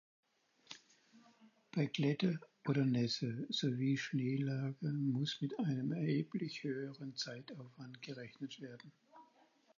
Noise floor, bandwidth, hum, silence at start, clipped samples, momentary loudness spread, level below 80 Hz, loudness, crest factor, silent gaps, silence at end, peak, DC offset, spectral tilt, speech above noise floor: -71 dBFS; 7.2 kHz; none; 0.7 s; under 0.1%; 18 LU; -84 dBFS; -39 LUFS; 18 dB; none; 0.55 s; -22 dBFS; under 0.1%; -6 dB/octave; 32 dB